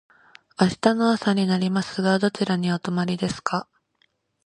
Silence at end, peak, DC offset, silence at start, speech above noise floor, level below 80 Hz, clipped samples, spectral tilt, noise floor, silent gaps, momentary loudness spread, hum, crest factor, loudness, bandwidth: 0.85 s; -2 dBFS; under 0.1%; 0.6 s; 46 dB; -60 dBFS; under 0.1%; -6 dB/octave; -68 dBFS; none; 7 LU; none; 22 dB; -23 LUFS; 10.5 kHz